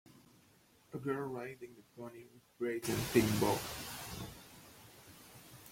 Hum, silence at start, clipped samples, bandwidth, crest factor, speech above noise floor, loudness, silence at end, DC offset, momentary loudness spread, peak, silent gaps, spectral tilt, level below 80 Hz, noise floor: none; 0.15 s; under 0.1%; 16.5 kHz; 24 dB; 30 dB; -37 LUFS; 0 s; under 0.1%; 24 LU; -16 dBFS; none; -5 dB/octave; -62 dBFS; -67 dBFS